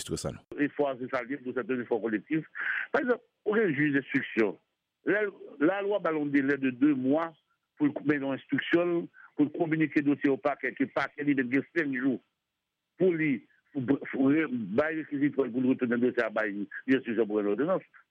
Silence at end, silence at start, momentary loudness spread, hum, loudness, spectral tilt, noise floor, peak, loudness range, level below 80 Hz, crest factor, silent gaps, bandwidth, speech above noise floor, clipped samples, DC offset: 0.3 s; 0 s; 7 LU; none; -29 LUFS; -6.5 dB/octave; -85 dBFS; -14 dBFS; 2 LU; -68 dBFS; 16 dB; none; 11 kHz; 56 dB; under 0.1%; under 0.1%